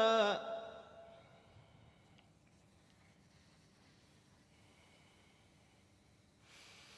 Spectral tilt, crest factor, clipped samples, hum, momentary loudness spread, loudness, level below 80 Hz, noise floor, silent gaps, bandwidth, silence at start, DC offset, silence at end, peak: -3.5 dB/octave; 24 dB; under 0.1%; none; 31 LU; -37 LUFS; -78 dBFS; -69 dBFS; none; 11 kHz; 0 s; under 0.1%; 5.9 s; -20 dBFS